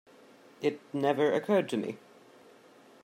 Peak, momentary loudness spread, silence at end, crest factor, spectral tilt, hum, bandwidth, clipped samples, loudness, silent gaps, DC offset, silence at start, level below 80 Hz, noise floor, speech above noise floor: -14 dBFS; 10 LU; 1.05 s; 18 dB; -6 dB/octave; none; 15.5 kHz; under 0.1%; -30 LUFS; none; under 0.1%; 0.6 s; -84 dBFS; -57 dBFS; 28 dB